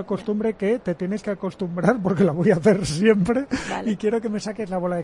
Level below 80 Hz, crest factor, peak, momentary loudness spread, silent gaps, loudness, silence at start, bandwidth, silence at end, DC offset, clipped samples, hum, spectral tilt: -50 dBFS; 18 dB; -4 dBFS; 9 LU; none; -22 LUFS; 0 s; 11.5 kHz; 0 s; under 0.1%; under 0.1%; none; -6.5 dB/octave